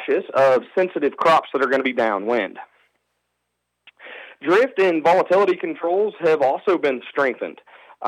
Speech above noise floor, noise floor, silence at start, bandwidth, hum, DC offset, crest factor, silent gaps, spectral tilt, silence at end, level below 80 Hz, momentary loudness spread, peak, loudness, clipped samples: 57 dB; -76 dBFS; 0 s; 11.5 kHz; 60 Hz at -60 dBFS; under 0.1%; 16 dB; none; -5.5 dB/octave; 0 s; -74 dBFS; 12 LU; -4 dBFS; -19 LUFS; under 0.1%